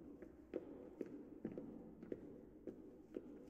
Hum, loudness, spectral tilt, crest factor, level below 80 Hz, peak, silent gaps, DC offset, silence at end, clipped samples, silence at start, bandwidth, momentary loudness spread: none; -54 LUFS; -9 dB/octave; 22 dB; -74 dBFS; -30 dBFS; none; under 0.1%; 0 s; under 0.1%; 0 s; 8.2 kHz; 7 LU